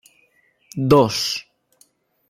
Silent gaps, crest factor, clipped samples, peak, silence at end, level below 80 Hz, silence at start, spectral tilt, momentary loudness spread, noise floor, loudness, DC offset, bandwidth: none; 20 dB; under 0.1%; -2 dBFS; 0.9 s; -56 dBFS; 0.75 s; -5 dB/octave; 14 LU; -61 dBFS; -18 LUFS; under 0.1%; 16 kHz